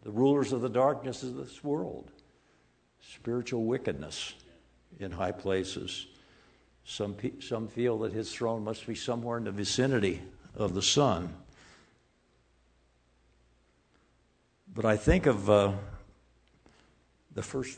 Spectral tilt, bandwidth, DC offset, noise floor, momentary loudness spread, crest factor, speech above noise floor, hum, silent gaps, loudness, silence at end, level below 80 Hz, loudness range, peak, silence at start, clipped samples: -5 dB/octave; 9.4 kHz; under 0.1%; -69 dBFS; 17 LU; 24 dB; 39 dB; none; none; -31 LUFS; 0 s; -50 dBFS; 7 LU; -8 dBFS; 0.05 s; under 0.1%